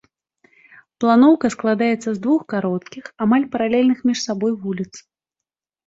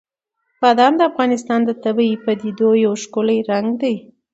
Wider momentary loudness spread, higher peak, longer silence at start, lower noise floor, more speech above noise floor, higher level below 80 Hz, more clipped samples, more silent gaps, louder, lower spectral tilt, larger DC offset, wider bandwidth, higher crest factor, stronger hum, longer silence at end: first, 13 LU vs 8 LU; about the same, -2 dBFS vs 0 dBFS; first, 1 s vs 0.6 s; first, -86 dBFS vs -73 dBFS; first, 68 dB vs 57 dB; first, -62 dBFS vs -68 dBFS; neither; neither; about the same, -19 LUFS vs -17 LUFS; about the same, -5.5 dB/octave vs -5 dB/octave; neither; about the same, 7.8 kHz vs 8 kHz; about the same, 18 dB vs 16 dB; neither; first, 0.85 s vs 0.3 s